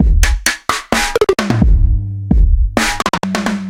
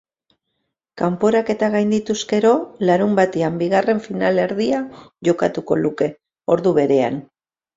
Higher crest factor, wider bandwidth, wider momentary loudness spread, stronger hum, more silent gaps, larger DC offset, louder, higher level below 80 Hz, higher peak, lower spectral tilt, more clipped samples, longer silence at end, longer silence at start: about the same, 12 dB vs 16 dB; first, 17 kHz vs 7.8 kHz; second, 4 LU vs 7 LU; neither; neither; neither; first, -15 LUFS vs -19 LUFS; first, -14 dBFS vs -58 dBFS; about the same, 0 dBFS vs -2 dBFS; second, -4.5 dB/octave vs -6 dB/octave; neither; second, 0 s vs 0.55 s; second, 0 s vs 0.95 s